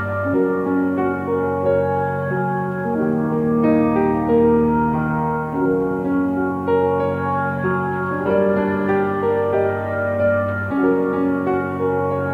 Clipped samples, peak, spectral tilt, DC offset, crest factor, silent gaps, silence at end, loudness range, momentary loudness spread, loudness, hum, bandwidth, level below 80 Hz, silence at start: under 0.1%; -6 dBFS; -10 dB/octave; under 0.1%; 12 dB; none; 0 s; 2 LU; 5 LU; -19 LUFS; none; 4.8 kHz; -46 dBFS; 0 s